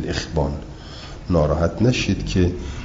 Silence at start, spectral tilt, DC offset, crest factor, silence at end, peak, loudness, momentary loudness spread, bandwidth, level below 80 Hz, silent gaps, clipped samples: 0 s; -6 dB/octave; under 0.1%; 16 dB; 0 s; -4 dBFS; -21 LUFS; 17 LU; 7.8 kHz; -32 dBFS; none; under 0.1%